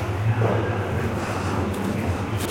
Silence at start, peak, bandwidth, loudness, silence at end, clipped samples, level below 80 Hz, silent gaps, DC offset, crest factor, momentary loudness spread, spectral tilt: 0 s; -8 dBFS; 16.5 kHz; -24 LUFS; 0 s; under 0.1%; -46 dBFS; none; under 0.1%; 14 dB; 4 LU; -6.5 dB/octave